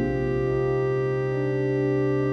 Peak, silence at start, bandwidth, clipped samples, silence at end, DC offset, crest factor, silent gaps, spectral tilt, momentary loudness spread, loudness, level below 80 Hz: -14 dBFS; 0 s; 6.2 kHz; under 0.1%; 0 s; under 0.1%; 10 dB; none; -9 dB/octave; 2 LU; -25 LUFS; -44 dBFS